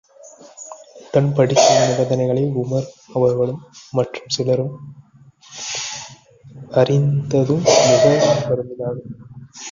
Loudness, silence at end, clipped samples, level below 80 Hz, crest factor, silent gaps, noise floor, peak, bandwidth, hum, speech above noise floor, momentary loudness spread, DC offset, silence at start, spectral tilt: -18 LUFS; 0 s; under 0.1%; -56 dBFS; 18 dB; none; -45 dBFS; -2 dBFS; 7.6 kHz; none; 28 dB; 23 LU; under 0.1%; 0.25 s; -5 dB/octave